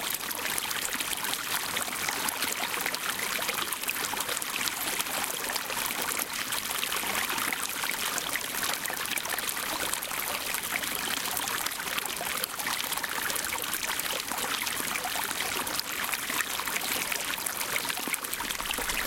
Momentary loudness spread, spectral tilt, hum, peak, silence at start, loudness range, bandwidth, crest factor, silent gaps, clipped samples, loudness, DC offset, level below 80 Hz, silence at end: 2 LU; 0 dB/octave; none; -4 dBFS; 0 s; 1 LU; 17 kHz; 28 dB; none; under 0.1%; -29 LUFS; under 0.1%; -58 dBFS; 0 s